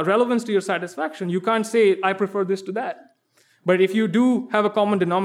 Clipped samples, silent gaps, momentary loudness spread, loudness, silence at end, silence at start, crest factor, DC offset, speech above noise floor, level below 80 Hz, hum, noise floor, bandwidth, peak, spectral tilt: under 0.1%; none; 10 LU; -21 LUFS; 0 s; 0 s; 16 dB; under 0.1%; 41 dB; -80 dBFS; none; -62 dBFS; 13.5 kHz; -6 dBFS; -6 dB/octave